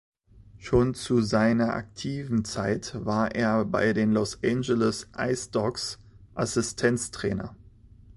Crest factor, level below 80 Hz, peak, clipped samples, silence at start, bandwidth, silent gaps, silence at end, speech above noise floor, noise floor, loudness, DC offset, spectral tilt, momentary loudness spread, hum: 18 dB; -50 dBFS; -8 dBFS; under 0.1%; 0.35 s; 11.5 kHz; none; 0.6 s; 27 dB; -52 dBFS; -27 LUFS; under 0.1%; -5.5 dB/octave; 10 LU; none